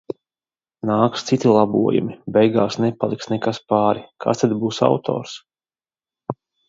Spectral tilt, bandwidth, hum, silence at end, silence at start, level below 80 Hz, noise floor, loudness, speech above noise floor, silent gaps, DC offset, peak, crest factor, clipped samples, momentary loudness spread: -6.5 dB/octave; 7.8 kHz; none; 0.35 s; 0.1 s; -60 dBFS; under -90 dBFS; -19 LUFS; over 71 dB; none; under 0.1%; 0 dBFS; 20 dB; under 0.1%; 16 LU